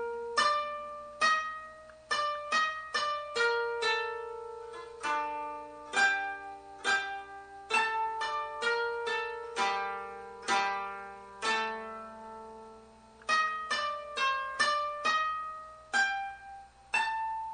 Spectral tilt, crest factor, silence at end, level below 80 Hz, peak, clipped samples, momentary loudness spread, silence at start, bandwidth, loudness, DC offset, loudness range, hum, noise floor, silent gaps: -0.5 dB/octave; 18 dB; 0 s; -68 dBFS; -14 dBFS; under 0.1%; 17 LU; 0 s; 9.4 kHz; -31 LUFS; under 0.1%; 3 LU; 60 Hz at -70 dBFS; -55 dBFS; none